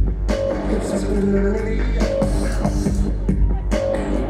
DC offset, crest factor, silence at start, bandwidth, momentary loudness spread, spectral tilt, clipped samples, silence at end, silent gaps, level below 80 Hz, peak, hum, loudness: under 0.1%; 12 dB; 0 s; 11 kHz; 3 LU; -7 dB/octave; under 0.1%; 0 s; none; -22 dBFS; -6 dBFS; none; -21 LUFS